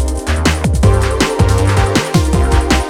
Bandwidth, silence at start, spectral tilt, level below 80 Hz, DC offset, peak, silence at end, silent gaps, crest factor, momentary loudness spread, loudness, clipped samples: 15.5 kHz; 0 s; -5.5 dB/octave; -16 dBFS; under 0.1%; 0 dBFS; 0 s; none; 12 dB; 2 LU; -13 LUFS; under 0.1%